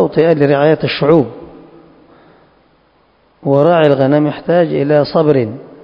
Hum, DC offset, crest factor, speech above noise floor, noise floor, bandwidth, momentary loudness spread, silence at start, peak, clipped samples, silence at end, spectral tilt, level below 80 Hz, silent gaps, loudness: none; under 0.1%; 14 dB; 42 dB; -53 dBFS; 5.4 kHz; 5 LU; 0 s; 0 dBFS; 0.2%; 0.15 s; -9.5 dB/octave; -50 dBFS; none; -12 LUFS